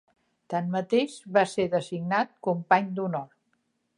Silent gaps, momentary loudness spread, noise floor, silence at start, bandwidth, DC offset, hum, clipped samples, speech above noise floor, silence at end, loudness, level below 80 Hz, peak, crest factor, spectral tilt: none; 8 LU; -74 dBFS; 0.5 s; 11.5 kHz; under 0.1%; none; under 0.1%; 48 dB; 0.7 s; -27 LUFS; -72 dBFS; -6 dBFS; 22 dB; -6 dB/octave